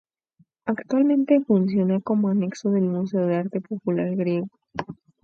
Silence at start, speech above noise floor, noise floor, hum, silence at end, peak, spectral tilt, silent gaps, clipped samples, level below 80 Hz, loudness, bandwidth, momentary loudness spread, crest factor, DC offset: 0.65 s; 41 dB; -63 dBFS; none; 0.3 s; -6 dBFS; -8.5 dB/octave; none; under 0.1%; -66 dBFS; -23 LUFS; 7 kHz; 14 LU; 16 dB; under 0.1%